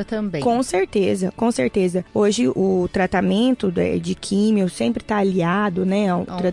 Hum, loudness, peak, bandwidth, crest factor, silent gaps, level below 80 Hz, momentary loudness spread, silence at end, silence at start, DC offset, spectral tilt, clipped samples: none; -20 LUFS; -8 dBFS; 11.5 kHz; 12 dB; none; -48 dBFS; 4 LU; 0 s; 0 s; under 0.1%; -6 dB/octave; under 0.1%